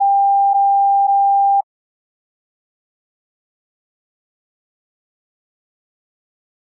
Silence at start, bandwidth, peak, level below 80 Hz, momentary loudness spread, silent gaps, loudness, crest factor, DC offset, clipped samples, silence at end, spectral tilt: 0 s; 1 kHz; -10 dBFS; under -90 dBFS; 4 LU; none; -14 LUFS; 10 dB; under 0.1%; under 0.1%; 5 s; 22 dB/octave